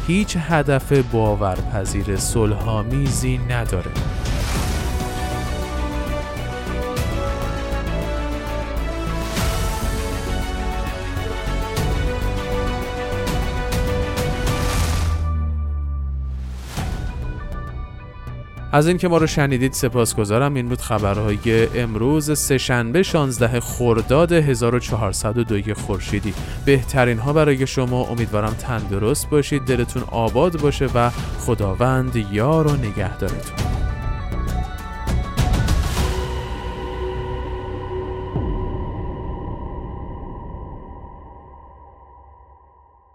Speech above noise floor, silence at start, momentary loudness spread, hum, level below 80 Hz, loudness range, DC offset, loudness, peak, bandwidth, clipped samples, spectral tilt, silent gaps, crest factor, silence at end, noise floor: 33 dB; 0 s; 12 LU; none; -28 dBFS; 9 LU; under 0.1%; -21 LUFS; -2 dBFS; 16.5 kHz; under 0.1%; -5.5 dB/octave; none; 18 dB; 0.7 s; -51 dBFS